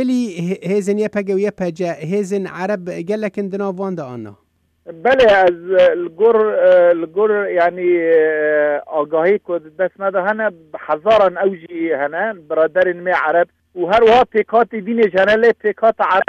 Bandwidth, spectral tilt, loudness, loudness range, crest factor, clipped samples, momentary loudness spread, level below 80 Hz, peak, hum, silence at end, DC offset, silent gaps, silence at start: 9.6 kHz; -6 dB/octave; -16 LUFS; 7 LU; 12 dB; under 0.1%; 11 LU; -54 dBFS; -4 dBFS; none; 0.05 s; under 0.1%; none; 0 s